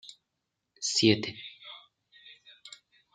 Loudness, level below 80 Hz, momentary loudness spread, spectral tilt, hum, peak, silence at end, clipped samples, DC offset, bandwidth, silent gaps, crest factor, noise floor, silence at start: -27 LUFS; -76 dBFS; 27 LU; -3.5 dB/octave; none; -8 dBFS; 0.45 s; under 0.1%; under 0.1%; 9.6 kHz; none; 26 dB; -84 dBFS; 0.05 s